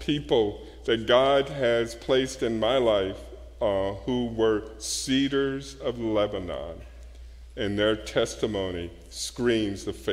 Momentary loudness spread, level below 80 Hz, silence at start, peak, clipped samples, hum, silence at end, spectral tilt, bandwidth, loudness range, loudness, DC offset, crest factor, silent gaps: 12 LU; -46 dBFS; 0 s; -6 dBFS; under 0.1%; none; 0 s; -4.5 dB/octave; 15.5 kHz; 5 LU; -26 LUFS; under 0.1%; 20 dB; none